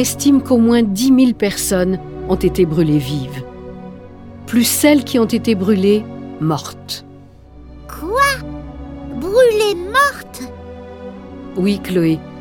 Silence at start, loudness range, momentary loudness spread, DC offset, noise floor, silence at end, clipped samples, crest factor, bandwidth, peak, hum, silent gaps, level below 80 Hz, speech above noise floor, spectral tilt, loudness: 0 s; 4 LU; 20 LU; under 0.1%; -40 dBFS; 0 s; under 0.1%; 16 dB; 19 kHz; 0 dBFS; none; none; -38 dBFS; 25 dB; -5 dB/octave; -15 LUFS